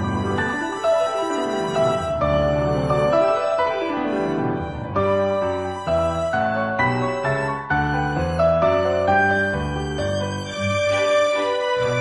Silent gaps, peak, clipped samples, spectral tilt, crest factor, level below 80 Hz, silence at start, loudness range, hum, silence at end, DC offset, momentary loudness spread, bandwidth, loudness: none; -6 dBFS; under 0.1%; -6 dB/octave; 14 dB; -42 dBFS; 0 s; 2 LU; none; 0 s; 0.2%; 6 LU; 11.5 kHz; -21 LUFS